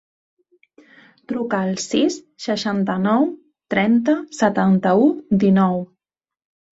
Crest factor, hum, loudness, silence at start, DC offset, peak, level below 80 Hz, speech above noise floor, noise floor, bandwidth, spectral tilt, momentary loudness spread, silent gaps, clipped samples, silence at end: 16 dB; none; -19 LUFS; 1.3 s; under 0.1%; -4 dBFS; -60 dBFS; 72 dB; -90 dBFS; 8 kHz; -6 dB/octave; 11 LU; none; under 0.1%; 0.9 s